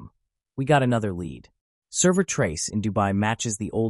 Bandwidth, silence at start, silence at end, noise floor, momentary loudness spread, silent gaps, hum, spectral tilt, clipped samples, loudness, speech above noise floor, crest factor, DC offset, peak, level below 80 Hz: 12 kHz; 0 s; 0 s; -62 dBFS; 12 LU; 1.61-1.82 s; none; -5 dB/octave; under 0.1%; -24 LUFS; 38 dB; 18 dB; under 0.1%; -6 dBFS; -52 dBFS